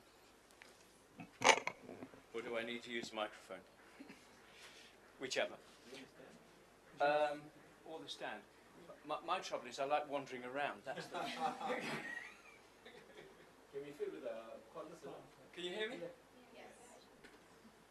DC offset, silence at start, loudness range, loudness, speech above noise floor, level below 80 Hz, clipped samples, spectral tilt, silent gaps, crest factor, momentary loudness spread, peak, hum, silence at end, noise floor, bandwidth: under 0.1%; 0 s; 10 LU; -42 LUFS; 23 dB; -82 dBFS; under 0.1%; -2 dB/octave; none; 34 dB; 23 LU; -10 dBFS; none; 0.05 s; -66 dBFS; 13 kHz